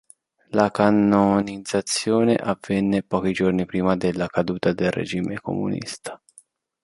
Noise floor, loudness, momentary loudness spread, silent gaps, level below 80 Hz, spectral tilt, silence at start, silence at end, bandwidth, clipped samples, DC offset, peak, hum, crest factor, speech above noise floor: -55 dBFS; -22 LUFS; 9 LU; none; -52 dBFS; -5.5 dB/octave; 0.5 s; 0.65 s; 11.5 kHz; under 0.1%; under 0.1%; -2 dBFS; none; 20 dB; 34 dB